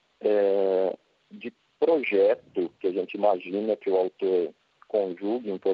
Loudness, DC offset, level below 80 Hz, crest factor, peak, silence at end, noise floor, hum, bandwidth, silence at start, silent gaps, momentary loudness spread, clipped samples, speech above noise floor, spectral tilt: -26 LUFS; under 0.1%; -80 dBFS; 16 dB; -10 dBFS; 0 s; -48 dBFS; none; 5.2 kHz; 0.2 s; none; 12 LU; under 0.1%; 22 dB; -8.5 dB/octave